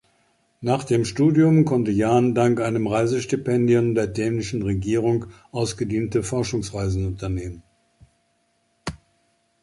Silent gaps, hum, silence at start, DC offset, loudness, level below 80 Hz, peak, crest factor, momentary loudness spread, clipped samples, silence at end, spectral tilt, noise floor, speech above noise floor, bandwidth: none; none; 0.6 s; under 0.1%; -22 LUFS; -44 dBFS; -6 dBFS; 16 dB; 12 LU; under 0.1%; 0.65 s; -7 dB/octave; -67 dBFS; 47 dB; 11.5 kHz